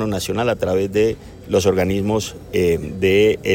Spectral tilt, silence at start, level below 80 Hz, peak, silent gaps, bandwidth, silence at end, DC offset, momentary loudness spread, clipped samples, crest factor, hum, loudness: -5.5 dB/octave; 0 s; -42 dBFS; -4 dBFS; none; 17 kHz; 0 s; under 0.1%; 6 LU; under 0.1%; 14 dB; none; -19 LUFS